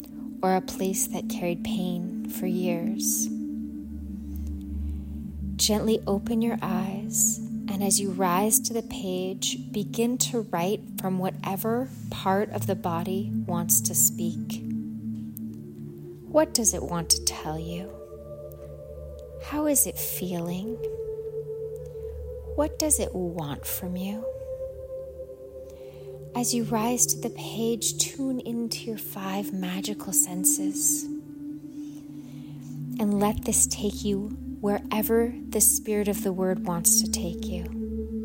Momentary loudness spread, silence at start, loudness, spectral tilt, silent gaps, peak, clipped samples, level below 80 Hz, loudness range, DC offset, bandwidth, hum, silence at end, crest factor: 17 LU; 0 s; -26 LUFS; -3.5 dB/octave; none; -6 dBFS; under 0.1%; -44 dBFS; 5 LU; under 0.1%; 16.5 kHz; none; 0 s; 22 dB